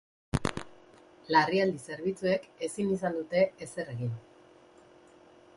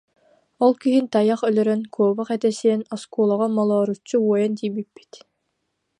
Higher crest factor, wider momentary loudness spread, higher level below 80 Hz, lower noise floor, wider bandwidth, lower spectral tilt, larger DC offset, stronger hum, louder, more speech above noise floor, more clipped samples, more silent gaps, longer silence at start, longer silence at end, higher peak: first, 22 dB vs 16 dB; first, 12 LU vs 7 LU; first, -54 dBFS vs -74 dBFS; second, -57 dBFS vs -75 dBFS; about the same, 11.5 kHz vs 10.5 kHz; about the same, -5.5 dB/octave vs -6.5 dB/octave; neither; neither; second, -31 LUFS vs -21 LUFS; second, 28 dB vs 54 dB; neither; neither; second, 0.35 s vs 0.6 s; first, 1.35 s vs 0.85 s; second, -10 dBFS vs -4 dBFS